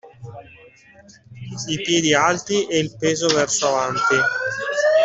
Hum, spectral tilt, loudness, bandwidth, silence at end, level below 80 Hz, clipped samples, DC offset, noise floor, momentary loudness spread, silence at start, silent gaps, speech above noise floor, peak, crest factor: none; -3 dB/octave; -19 LUFS; 8.4 kHz; 0 s; -58 dBFS; under 0.1%; under 0.1%; -40 dBFS; 19 LU; 0.05 s; none; 19 dB; -2 dBFS; 18 dB